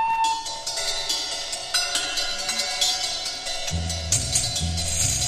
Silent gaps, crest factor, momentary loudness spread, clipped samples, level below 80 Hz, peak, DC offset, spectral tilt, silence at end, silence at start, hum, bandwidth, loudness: none; 18 dB; 6 LU; under 0.1%; -40 dBFS; -8 dBFS; under 0.1%; -1 dB/octave; 0 s; 0 s; none; 15.5 kHz; -23 LUFS